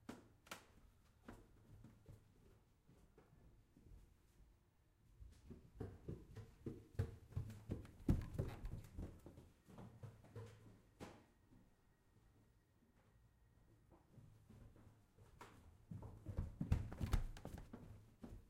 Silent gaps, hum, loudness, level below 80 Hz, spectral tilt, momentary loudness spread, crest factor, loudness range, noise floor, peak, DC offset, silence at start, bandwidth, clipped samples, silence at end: none; none; -51 LUFS; -56 dBFS; -7 dB/octave; 23 LU; 28 dB; 19 LU; -76 dBFS; -24 dBFS; under 0.1%; 0.1 s; 15.5 kHz; under 0.1%; 0 s